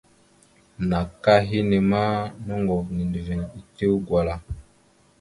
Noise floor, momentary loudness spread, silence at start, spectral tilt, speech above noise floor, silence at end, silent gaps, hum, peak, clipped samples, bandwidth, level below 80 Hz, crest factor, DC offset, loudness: -59 dBFS; 12 LU; 0.8 s; -8 dB/octave; 36 dB; 0.6 s; none; none; -4 dBFS; under 0.1%; 11.5 kHz; -42 dBFS; 20 dB; under 0.1%; -23 LUFS